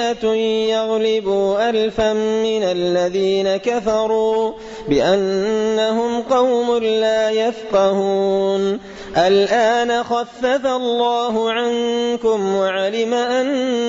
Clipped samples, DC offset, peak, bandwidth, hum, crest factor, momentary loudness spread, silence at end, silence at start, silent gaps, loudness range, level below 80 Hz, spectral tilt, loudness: under 0.1%; under 0.1%; -6 dBFS; 7.8 kHz; none; 12 dB; 4 LU; 0 s; 0 s; none; 1 LU; -50 dBFS; -4.5 dB/octave; -18 LUFS